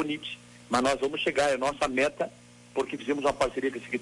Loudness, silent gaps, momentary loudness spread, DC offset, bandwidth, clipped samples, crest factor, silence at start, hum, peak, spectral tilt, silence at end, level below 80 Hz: -28 LUFS; none; 10 LU; under 0.1%; 11.5 kHz; under 0.1%; 16 dB; 0 s; 60 Hz at -55 dBFS; -12 dBFS; -3.5 dB/octave; 0 s; -56 dBFS